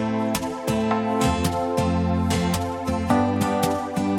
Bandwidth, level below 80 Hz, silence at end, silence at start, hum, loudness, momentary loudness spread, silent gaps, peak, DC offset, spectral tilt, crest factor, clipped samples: 17.5 kHz; -40 dBFS; 0 s; 0 s; none; -23 LUFS; 4 LU; none; -8 dBFS; under 0.1%; -6 dB/octave; 16 dB; under 0.1%